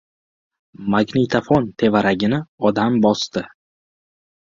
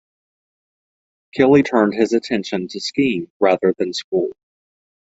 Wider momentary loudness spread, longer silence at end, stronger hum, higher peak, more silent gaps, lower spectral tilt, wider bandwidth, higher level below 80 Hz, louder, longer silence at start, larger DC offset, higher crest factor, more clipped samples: about the same, 9 LU vs 10 LU; first, 1.15 s vs 0.85 s; neither; about the same, -2 dBFS vs -2 dBFS; second, 2.48-2.58 s vs 3.30-3.40 s, 4.04-4.12 s; about the same, -6 dB/octave vs -5.5 dB/octave; about the same, 7.6 kHz vs 8 kHz; first, -52 dBFS vs -60 dBFS; about the same, -18 LUFS vs -18 LUFS; second, 0.8 s vs 1.35 s; neither; about the same, 18 dB vs 18 dB; neither